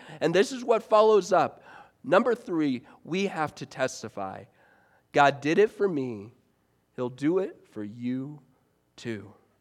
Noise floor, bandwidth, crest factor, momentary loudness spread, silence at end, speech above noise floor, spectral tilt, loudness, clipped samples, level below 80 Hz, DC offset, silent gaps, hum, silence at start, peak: -69 dBFS; 12.5 kHz; 22 dB; 18 LU; 0.3 s; 43 dB; -5.5 dB/octave; -26 LUFS; under 0.1%; -76 dBFS; under 0.1%; none; none; 0 s; -6 dBFS